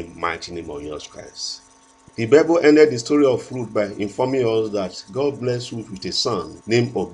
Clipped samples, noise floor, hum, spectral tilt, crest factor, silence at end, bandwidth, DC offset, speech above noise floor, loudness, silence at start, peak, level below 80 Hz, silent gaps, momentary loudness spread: under 0.1%; -51 dBFS; none; -5 dB/octave; 20 dB; 0 s; 10.5 kHz; under 0.1%; 31 dB; -20 LUFS; 0 s; 0 dBFS; -54 dBFS; none; 17 LU